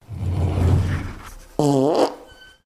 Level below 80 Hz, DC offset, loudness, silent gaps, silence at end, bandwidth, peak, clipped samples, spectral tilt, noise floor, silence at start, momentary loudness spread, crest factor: -34 dBFS; under 0.1%; -21 LUFS; none; 0.4 s; 12.5 kHz; -2 dBFS; under 0.1%; -7.5 dB/octave; -45 dBFS; 0.1 s; 16 LU; 18 dB